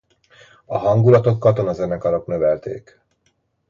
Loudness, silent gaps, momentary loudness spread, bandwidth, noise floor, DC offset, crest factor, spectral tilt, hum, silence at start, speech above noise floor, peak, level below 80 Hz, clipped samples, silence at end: -18 LUFS; none; 13 LU; 7.2 kHz; -66 dBFS; under 0.1%; 18 dB; -9.5 dB/octave; none; 0.7 s; 49 dB; -2 dBFS; -50 dBFS; under 0.1%; 0.9 s